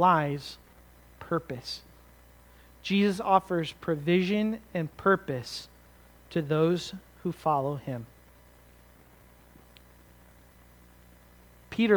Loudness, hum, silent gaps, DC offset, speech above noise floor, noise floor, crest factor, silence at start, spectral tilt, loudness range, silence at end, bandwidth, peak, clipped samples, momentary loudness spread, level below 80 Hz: -29 LUFS; 60 Hz at -55 dBFS; none; under 0.1%; 28 dB; -56 dBFS; 22 dB; 0 s; -6.5 dB/octave; 8 LU; 0 s; over 20 kHz; -8 dBFS; under 0.1%; 15 LU; -58 dBFS